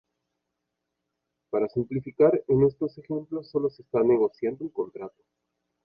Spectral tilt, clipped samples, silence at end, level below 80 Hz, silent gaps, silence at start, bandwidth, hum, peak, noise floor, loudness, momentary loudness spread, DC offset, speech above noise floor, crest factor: -11.5 dB/octave; under 0.1%; 0.75 s; -60 dBFS; none; 1.55 s; 5.4 kHz; none; -8 dBFS; -83 dBFS; -26 LUFS; 12 LU; under 0.1%; 57 dB; 20 dB